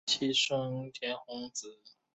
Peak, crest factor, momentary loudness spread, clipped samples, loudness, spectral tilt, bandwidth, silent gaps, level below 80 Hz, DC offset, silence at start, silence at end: -18 dBFS; 18 dB; 13 LU; under 0.1%; -33 LUFS; -3 dB/octave; 8.2 kHz; none; -76 dBFS; under 0.1%; 0.05 s; 0.25 s